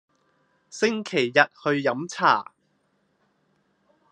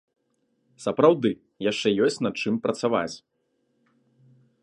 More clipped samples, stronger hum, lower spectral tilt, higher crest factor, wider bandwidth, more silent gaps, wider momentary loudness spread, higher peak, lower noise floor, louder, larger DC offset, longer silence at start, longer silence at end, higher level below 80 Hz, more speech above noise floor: neither; neither; second, -4 dB/octave vs -5.5 dB/octave; about the same, 26 dB vs 22 dB; about the same, 10.5 kHz vs 11 kHz; neither; second, 7 LU vs 11 LU; about the same, -2 dBFS vs -4 dBFS; about the same, -69 dBFS vs -72 dBFS; about the same, -23 LUFS vs -24 LUFS; neither; about the same, 0.75 s vs 0.8 s; first, 1.7 s vs 1.45 s; second, -76 dBFS vs -68 dBFS; about the same, 46 dB vs 48 dB